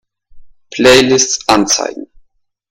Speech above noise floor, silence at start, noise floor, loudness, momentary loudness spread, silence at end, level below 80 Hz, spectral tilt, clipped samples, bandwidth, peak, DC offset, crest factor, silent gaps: 44 dB; 0.35 s; -54 dBFS; -10 LUFS; 17 LU; 0.65 s; -42 dBFS; -2.5 dB/octave; 0.3%; 17 kHz; 0 dBFS; under 0.1%; 14 dB; none